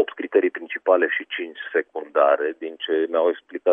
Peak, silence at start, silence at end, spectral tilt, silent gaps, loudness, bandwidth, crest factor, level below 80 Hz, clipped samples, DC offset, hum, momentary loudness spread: -4 dBFS; 0 s; 0 s; -6 dB/octave; none; -22 LUFS; 3.8 kHz; 18 dB; -84 dBFS; under 0.1%; under 0.1%; none; 8 LU